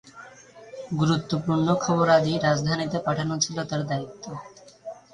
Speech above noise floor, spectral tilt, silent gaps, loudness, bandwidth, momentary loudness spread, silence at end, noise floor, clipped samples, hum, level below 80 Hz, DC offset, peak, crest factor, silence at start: 23 dB; -5 dB/octave; none; -24 LUFS; 10.5 kHz; 22 LU; 0.2 s; -47 dBFS; under 0.1%; none; -58 dBFS; under 0.1%; -6 dBFS; 20 dB; 0.05 s